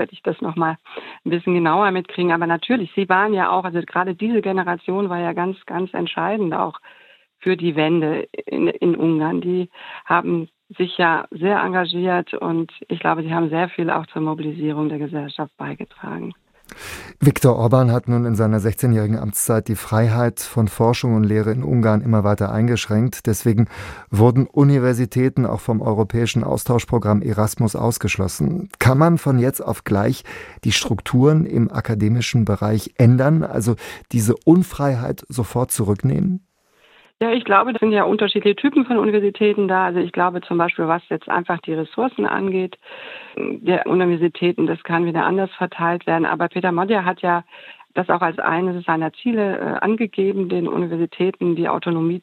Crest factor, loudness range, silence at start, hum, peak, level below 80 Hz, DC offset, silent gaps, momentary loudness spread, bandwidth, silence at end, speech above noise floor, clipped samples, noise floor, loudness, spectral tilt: 18 dB; 4 LU; 0 s; none; -2 dBFS; -50 dBFS; under 0.1%; none; 10 LU; 16.5 kHz; 0.05 s; 38 dB; under 0.1%; -56 dBFS; -19 LUFS; -6.5 dB/octave